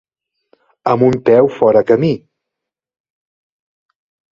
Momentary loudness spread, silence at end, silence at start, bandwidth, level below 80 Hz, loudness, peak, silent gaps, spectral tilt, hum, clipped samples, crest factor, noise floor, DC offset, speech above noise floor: 9 LU; 2.15 s; 0.85 s; 7.4 kHz; -54 dBFS; -13 LUFS; 0 dBFS; none; -8.5 dB/octave; none; under 0.1%; 16 dB; -82 dBFS; under 0.1%; 71 dB